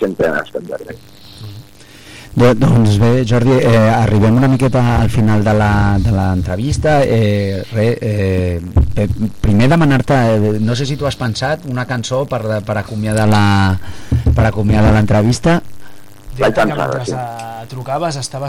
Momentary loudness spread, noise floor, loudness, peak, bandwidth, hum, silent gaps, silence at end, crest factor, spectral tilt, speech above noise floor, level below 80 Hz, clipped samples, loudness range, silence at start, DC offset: 12 LU; -39 dBFS; -14 LUFS; -2 dBFS; 15 kHz; none; none; 0 s; 12 dB; -7 dB/octave; 26 dB; -28 dBFS; under 0.1%; 4 LU; 0 s; under 0.1%